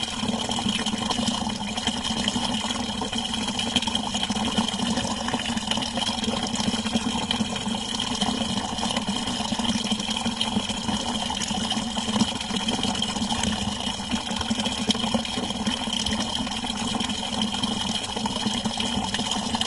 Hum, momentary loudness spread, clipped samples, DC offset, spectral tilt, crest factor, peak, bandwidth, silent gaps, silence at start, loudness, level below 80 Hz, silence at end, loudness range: none; 3 LU; under 0.1%; under 0.1%; -3 dB/octave; 22 dB; -6 dBFS; 11.5 kHz; none; 0 s; -25 LUFS; -44 dBFS; 0 s; 1 LU